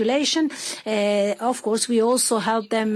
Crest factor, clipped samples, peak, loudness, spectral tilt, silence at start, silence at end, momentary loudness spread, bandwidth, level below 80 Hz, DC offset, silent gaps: 12 dB; under 0.1%; -8 dBFS; -21 LUFS; -3 dB/octave; 0 s; 0 s; 6 LU; 13.5 kHz; -70 dBFS; under 0.1%; none